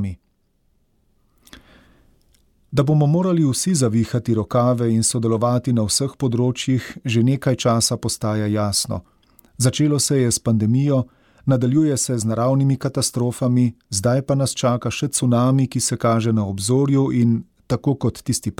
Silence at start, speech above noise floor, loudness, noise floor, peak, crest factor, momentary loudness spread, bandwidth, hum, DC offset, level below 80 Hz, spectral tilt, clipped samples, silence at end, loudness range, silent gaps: 0 s; 46 dB; -19 LUFS; -64 dBFS; -6 dBFS; 14 dB; 5 LU; 17 kHz; none; under 0.1%; -50 dBFS; -5.5 dB/octave; under 0.1%; 0.05 s; 2 LU; none